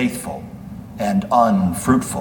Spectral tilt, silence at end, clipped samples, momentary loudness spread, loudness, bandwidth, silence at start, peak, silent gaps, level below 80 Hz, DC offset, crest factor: -6 dB/octave; 0 s; under 0.1%; 19 LU; -18 LUFS; 19 kHz; 0 s; -2 dBFS; none; -44 dBFS; under 0.1%; 16 dB